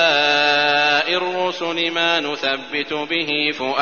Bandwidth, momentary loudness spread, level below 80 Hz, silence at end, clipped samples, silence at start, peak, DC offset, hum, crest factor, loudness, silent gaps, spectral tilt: 7 kHz; 7 LU; -70 dBFS; 0 s; under 0.1%; 0 s; -4 dBFS; 0.3%; none; 14 dB; -18 LUFS; none; 0.5 dB/octave